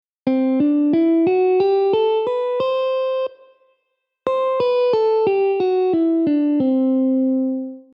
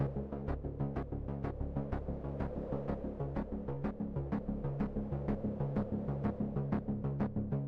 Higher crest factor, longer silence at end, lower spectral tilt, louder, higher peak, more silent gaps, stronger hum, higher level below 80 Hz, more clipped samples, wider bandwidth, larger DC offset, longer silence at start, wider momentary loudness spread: about the same, 12 dB vs 12 dB; first, 0.15 s vs 0 s; second, -8 dB/octave vs -11.5 dB/octave; first, -18 LUFS vs -39 LUFS; first, -6 dBFS vs -24 dBFS; neither; neither; second, -66 dBFS vs -46 dBFS; neither; first, 5.6 kHz vs 4.8 kHz; neither; first, 0.25 s vs 0 s; about the same, 6 LU vs 4 LU